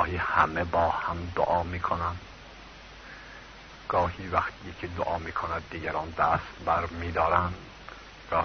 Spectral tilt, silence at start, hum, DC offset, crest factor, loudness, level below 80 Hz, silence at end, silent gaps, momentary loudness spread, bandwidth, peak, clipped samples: -6.5 dB/octave; 0 s; none; under 0.1%; 24 dB; -28 LUFS; -46 dBFS; 0 s; none; 20 LU; 6.6 kHz; -6 dBFS; under 0.1%